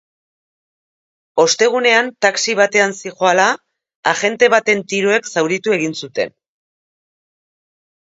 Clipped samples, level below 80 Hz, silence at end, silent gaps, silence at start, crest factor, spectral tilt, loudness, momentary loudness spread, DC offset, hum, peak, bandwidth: under 0.1%; -68 dBFS; 1.8 s; 3.95-4.03 s; 1.35 s; 18 dB; -2.5 dB/octave; -15 LUFS; 9 LU; under 0.1%; none; 0 dBFS; 8 kHz